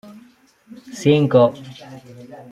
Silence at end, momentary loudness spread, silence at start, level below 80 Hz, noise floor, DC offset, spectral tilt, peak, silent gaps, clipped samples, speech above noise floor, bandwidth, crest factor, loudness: 0.1 s; 25 LU; 0.9 s; -60 dBFS; -52 dBFS; under 0.1%; -7 dB/octave; -2 dBFS; none; under 0.1%; 34 dB; 12.5 kHz; 18 dB; -16 LUFS